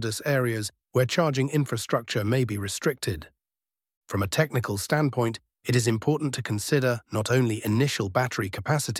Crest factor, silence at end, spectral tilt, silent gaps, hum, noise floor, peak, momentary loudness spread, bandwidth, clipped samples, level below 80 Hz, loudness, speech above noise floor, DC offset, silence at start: 18 dB; 0 s; -5 dB/octave; 3.97-4.01 s; none; under -90 dBFS; -8 dBFS; 6 LU; 16.5 kHz; under 0.1%; -56 dBFS; -26 LUFS; over 65 dB; under 0.1%; 0 s